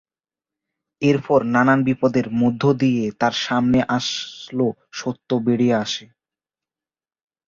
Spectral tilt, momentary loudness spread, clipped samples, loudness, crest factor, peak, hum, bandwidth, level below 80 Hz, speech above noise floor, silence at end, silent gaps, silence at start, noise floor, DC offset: -6 dB/octave; 11 LU; under 0.1%; -20 LUFS; 18 dB; -4 dBFS; none; 7.4 kHz; -54 dBFS; over 71 dB; 1.45 s; none; 1 s; under -90 dBFS; under 0.1%